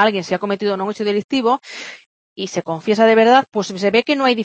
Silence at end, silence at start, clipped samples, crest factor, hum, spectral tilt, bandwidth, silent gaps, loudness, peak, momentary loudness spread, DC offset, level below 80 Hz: 0 s; 0 s; under 0.1%; 16 dB; none; -4.5 dB/octave; 8.6 kHz; 1.24-1.29 s, 2.06-2.36 s; -17 LUFS; 0 dBFS; 14 LU; under 0.1%; -66 dBFS